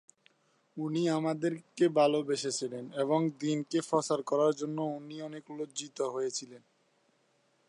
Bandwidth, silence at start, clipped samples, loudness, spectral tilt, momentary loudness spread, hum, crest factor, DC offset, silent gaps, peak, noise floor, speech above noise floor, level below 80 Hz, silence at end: 11.5 kHz; 0.75 s; under 0.1%; -32 LUFS; -5 dB/octave; 13 LU; none; 20 dB; under 0.1%; none; -14 dBFS; -72 dBFS; 40 dB; -86 dBFS; 1.1 s